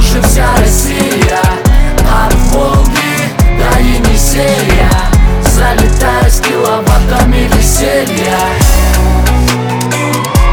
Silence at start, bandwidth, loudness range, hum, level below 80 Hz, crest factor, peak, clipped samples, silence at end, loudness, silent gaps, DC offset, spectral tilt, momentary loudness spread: 0 s; over 20 kHz; 1 LU; none; -10 dBFS; 8 dB; 0 dBFS; 0.2%; 0 s; -10 LUFS; none; under 0.1%; -4.5 dB/octave; 2 LU